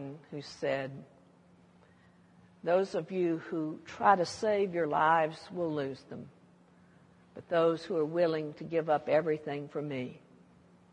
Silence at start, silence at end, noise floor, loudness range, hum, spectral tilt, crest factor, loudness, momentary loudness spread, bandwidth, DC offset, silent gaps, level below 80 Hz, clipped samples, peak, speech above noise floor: 0 s; 0.75 s; -62 dBFS; 6 LU; none; -6 dB/octave; 22 dB; -31 LUFS; 17 LU; 10.5 kHz; under 0.1%; none; -76 dBFS; under 0.1%; -10 dBFS; 30 dB